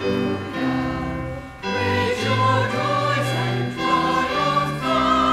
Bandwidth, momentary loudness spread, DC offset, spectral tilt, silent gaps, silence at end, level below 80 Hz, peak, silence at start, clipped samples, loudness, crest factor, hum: 15 kHz; 8 LU; under 0.1%; -5.5 dB/octave; none; 0 s; -44 dBFS; -6 dBFS; 0 s; under 0.1%; -21 LUFS; 14 dB; none